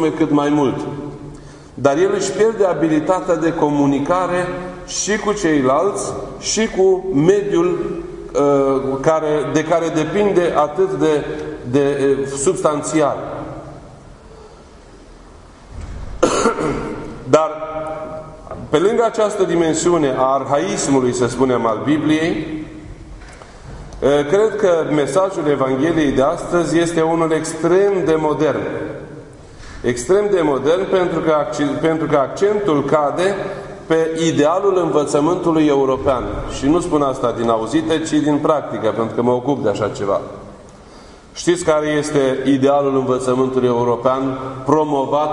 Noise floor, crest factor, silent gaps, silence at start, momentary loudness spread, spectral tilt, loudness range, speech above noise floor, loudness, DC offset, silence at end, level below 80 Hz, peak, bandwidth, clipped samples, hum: -41 dBFS; 18 dB; none; 0 s; 13 LU; -5.5 dB/octave; 4 LU; 25 dB; -17 LUFS; under 0.1%; 0 s; -42 dBFS; 0 dBFS; 11 kHz; under 0.1%; none